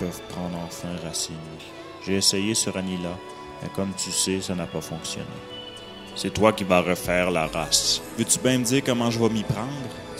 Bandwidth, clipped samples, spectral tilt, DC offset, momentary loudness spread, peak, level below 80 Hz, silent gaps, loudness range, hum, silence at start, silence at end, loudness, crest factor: 16 kHz; under 0.1%; -3.5 dB/octave; under 0.1%; 16 LU; -2 dBFS; -50 dBFS; none; 7 LU; none; 0 s; 0 s; -24 LUFS; 24 dB